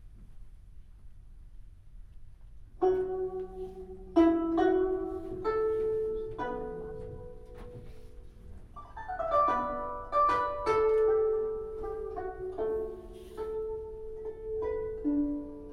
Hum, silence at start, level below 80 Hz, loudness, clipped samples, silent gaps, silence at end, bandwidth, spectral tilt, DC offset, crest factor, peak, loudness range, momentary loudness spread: none; 0 s; -50 dBFS; -31 LUFS; under 0.1%; none; 0 s; 10.5 kHz; -7.5 dB/octave; under 0.1%; 20 dB; -14 dBFS; 8 LU; 20 LU